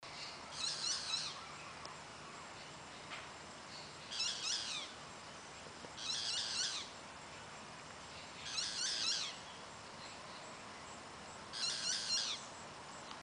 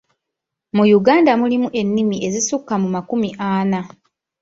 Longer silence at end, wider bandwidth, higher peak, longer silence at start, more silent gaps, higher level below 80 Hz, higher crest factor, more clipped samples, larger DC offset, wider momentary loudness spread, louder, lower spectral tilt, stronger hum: second, 0 s vs 0.55 s; first, 13 kHz vs 7.8 kHz; second, -24 dBFS vs -2 dBFS; second, 0 s vs 0.75 s; neither; second, -74 dBFS vs -58 dBFS; about the same, 20 dB vs 16 dB; neither; neither; first, 15 LU vs 9 LU; second, -42 LUFS vs -17 LUFS; second, 0 dB/octave vs -5 dB/octave; neither